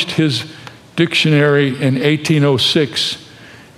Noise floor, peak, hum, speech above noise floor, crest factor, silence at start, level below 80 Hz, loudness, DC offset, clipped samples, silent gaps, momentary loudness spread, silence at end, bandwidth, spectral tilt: -39 dBFS; -2 dBFS; none; 25 dB; 14 dB; 0 s; -58 dBFS; -14 LUFS; under 0.1%; under 0.1%; none; 10 LU; 0.2 s; 14 kHz; -5.5 dB/octave